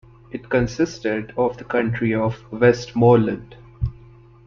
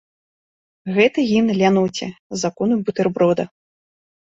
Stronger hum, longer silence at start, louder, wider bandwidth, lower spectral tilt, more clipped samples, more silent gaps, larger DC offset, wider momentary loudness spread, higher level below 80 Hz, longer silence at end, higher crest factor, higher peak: neither; second, 0.35 s vs 0.85 s; about the same, -21 LUFS vs -19 LUFS; second, 7.2 kHz vs 8 kHz; first, -7.5 dB/octave vs -5.5 dB/octave; neither; second, none vs 2.19-2.30 s; neither; about the same, 14 LU vs 12 LU; first, -42 dBFS vs -60 dBFS; second, 0.55 s vs 0.9 s; about the same, 18 dB vs 18 dB; about the same, -2 dBFS vs -2 dBFS